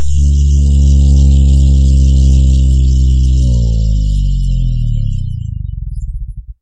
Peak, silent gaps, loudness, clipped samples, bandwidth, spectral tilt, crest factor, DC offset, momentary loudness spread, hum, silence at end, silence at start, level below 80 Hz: 0 dBFS; none; -11 LUFS; under 0.1%; 8.4 kHz; -7.5 dB/octave; 10 dB; under 0.1%; 14 LU; none; 0.1 s; 0 s; -10 dBFS